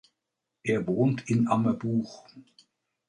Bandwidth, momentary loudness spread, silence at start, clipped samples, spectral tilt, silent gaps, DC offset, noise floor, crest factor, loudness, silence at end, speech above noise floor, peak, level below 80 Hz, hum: 10 kHz; 12 LU; 0.65 s; under 0.1%; -7.5 dB/octave; none; under 0.1%; -85 dBFS; 18 dB; -27 LUFS; 0.65 s; 58 dB; -10 dBFS; -64 dBFS; none